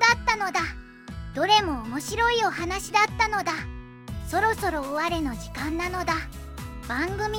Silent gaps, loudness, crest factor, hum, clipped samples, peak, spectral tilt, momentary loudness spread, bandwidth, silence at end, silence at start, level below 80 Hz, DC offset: none; -25 LUFS; 20 dB; none; under 0.1%; -6 dBFS; -3.5 dB/octave; 17 LU; 17 kHz; 0 s; 0 s; -42 dBFS; under 0.1%